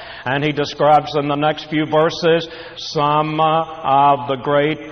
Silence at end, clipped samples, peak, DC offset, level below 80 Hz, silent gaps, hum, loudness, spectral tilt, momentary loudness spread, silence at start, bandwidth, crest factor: 0 s; under 0.1%; -2 dBFS; under 0.1%; -52 dBFS; none; none; -17 LUFS; -6 dB/octave; 7 LU; 0 s; 6.6 kHz; 14 dB